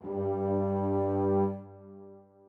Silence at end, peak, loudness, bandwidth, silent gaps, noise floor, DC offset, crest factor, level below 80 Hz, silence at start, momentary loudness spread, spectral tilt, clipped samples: 0.3 s; -18 dBFS; -30 LUFS; 3.1 kHz; none; -52 dBFS; under 0.1%; 14 dB; -72 dBFS; 0 s; 22 LU; -12 dB/octave; under 0.1%